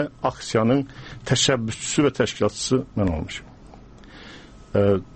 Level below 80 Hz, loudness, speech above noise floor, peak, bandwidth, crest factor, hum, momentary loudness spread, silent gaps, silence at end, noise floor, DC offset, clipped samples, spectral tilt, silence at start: -44 dBFS; -22 LUFS; 22 dB; -6 dBFS; 8.8 kHz; 16 dB; none; 16 LU; none; 0 s; -45 dBFS; under 0.1%; under 0.1%; -4.5 dB/octave; 0 s